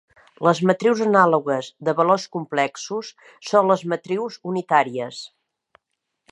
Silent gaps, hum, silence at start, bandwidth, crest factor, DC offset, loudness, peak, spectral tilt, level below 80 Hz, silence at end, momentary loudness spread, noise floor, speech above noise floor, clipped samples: none; none; 0.4 s; 11.5 kHz; 20 dB; under 0.1%; -21 LUFS; -2 dBFS; -5.5 dB/octave; -74 dBFS; 1.05 s; 14 LU; -77 dBFS; 57 dB; under 0.1%